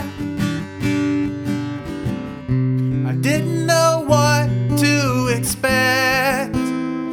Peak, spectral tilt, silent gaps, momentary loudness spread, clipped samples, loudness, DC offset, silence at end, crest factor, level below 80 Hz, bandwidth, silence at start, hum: -2 dBFS; -5 dB/octave; none; 10 LU; under 0.1%; -18 LUFS; under 0.1%; 0 s; 16 dB; -42 dBFS; 18.5 kHz; 0 s; none